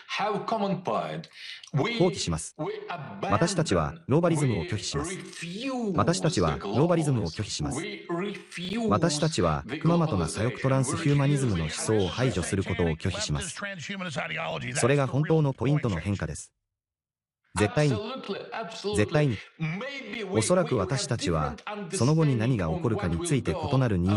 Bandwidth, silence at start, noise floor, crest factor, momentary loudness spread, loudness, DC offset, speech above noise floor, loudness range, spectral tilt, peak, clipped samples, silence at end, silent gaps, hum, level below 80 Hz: 12 kHz; 0 s; under -90 dBFS; 18 dB; 10 LU; -27 LUFS; under 0.1%; over 63 dB; 3 LU; -5.5 dB/octave; -8 dBFS; under 0.1%; 0 s; none; none; -48 dBFS